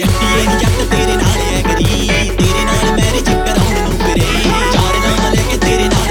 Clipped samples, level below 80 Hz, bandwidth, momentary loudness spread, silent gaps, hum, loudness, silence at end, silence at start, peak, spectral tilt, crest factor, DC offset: under 0.1%; -18 dBFS; 18.5 kHz; 2 LU; none; none; -13 LUFS; 0 s; 0 s; 0 dBFS; -4.5 dB/octave; 12 dB; under 0.1%